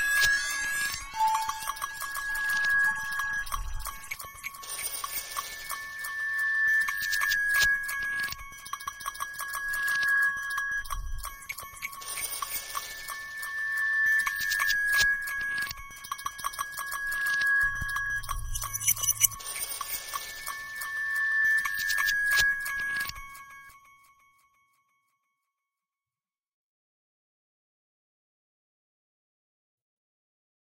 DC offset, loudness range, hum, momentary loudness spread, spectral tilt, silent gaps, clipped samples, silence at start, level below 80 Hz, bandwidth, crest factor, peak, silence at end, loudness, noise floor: under 0.1%; 5 LU; none; 14 LU; 1 dB/octave; none; under 0.1%; 0 s; -48 dBFS; 17 kHz; 28 dB; -4 dBFS; 6.85 s; -28 LUFS; under -90 dBFS